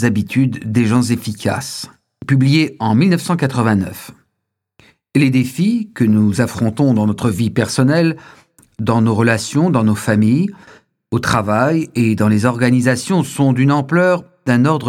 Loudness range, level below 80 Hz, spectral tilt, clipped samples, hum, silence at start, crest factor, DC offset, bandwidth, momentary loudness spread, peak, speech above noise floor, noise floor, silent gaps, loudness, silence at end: 2 LU; -50 dBFS; -6.5 dB/octave; under 0.1%; none; 0 s; 16 dB; under 0.1%; 16 kHz; 7 LU; 0 dBFS; 61 dB; -75 dBFS; none; -15 LUFS; 0 s